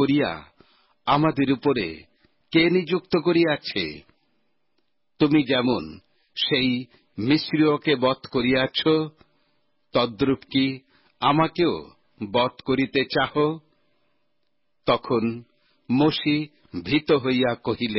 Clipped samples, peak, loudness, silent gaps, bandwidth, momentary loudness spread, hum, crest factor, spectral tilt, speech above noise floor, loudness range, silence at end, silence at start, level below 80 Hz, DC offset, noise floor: under 0.1%; -8 dBFS; -23 LUFS; none; 5.8 kHz; 12 LU; none; 16 dB; -10 dB/octave; 55 dB; 3 LU; 0 s; 0 s; -56 dBFS; under 0.1%; -77 dBFS